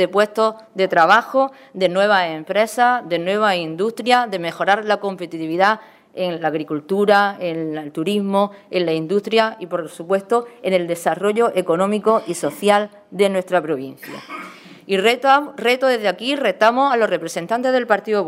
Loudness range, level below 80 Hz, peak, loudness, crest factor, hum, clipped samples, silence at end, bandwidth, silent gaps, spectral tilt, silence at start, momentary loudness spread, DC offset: 3 LU; -72 dBFS; 0 dBFS; -18 LUFS; 18 dB; none; under 0.1%; 0 s; 16 kHz; none; -4.5 dB/octave; 0 s; 10 LU; under 0.1%